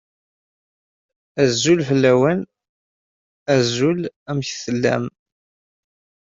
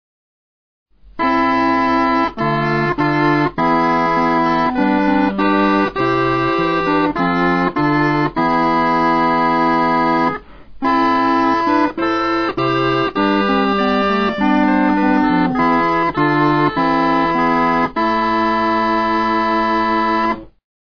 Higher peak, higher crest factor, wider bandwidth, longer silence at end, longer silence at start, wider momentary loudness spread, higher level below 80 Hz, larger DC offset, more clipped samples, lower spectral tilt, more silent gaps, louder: about the same, -4 dBFS vs -2 dBFS; about the same, 18 dB vs 14 dB; first, 7.8 kHz vs 5.4 kHz; first, 1.25 s vs 0.4 s; first, 1.35 s vs 1.15 s; first, 14 LU vs 2 LU; second, -60 dBFS vs -42 dBFS; second, under 0.1% vs 0.6%; neither; second, -5 dB/octave vs -7 dB/octave; first, 2.69-3.46 s, 4.16-4.26 s vs none; second, -19 LUFS vs -15 LUFS